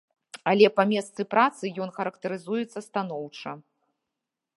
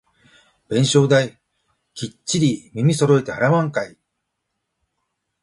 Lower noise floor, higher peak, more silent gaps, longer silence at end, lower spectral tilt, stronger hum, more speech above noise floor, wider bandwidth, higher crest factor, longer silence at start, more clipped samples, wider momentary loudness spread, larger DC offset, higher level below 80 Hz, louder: first, -86 dBFS vs -77 dBFS; about the same, -4 dBFS vs -2 dBFS; neither; second, 1 s vs 1.55 s; about the same, -5.5 dB/octave vs -5.5 dB/octave; neither; about the same, 60 dB vs 59 dB; about the same, 11.5 kHz vs 11.5 kHz; about the same, 22 dB vs 18 dB; second, 0.35 s vs 0.7 s; neither; about the same, 18 LU vs 16 LU; neither; second, -80 dBFS vs -58 dBFS; second, -26 LUFS vs -19 LUFS